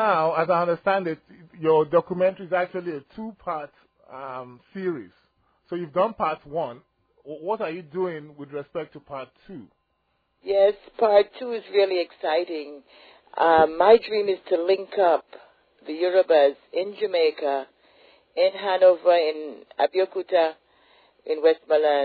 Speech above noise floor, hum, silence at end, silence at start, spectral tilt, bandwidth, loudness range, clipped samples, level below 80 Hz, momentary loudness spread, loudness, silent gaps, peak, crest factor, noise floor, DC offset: 49 dB; none; 0 s; 0 s; -8 dB/octave; 5 kHz; 10 LU; under 0.1%; -66 dBFS; 19 LU; -23 LUFS; none; -4 dBFS; 18 dB; -72 dBFS; under 0.1%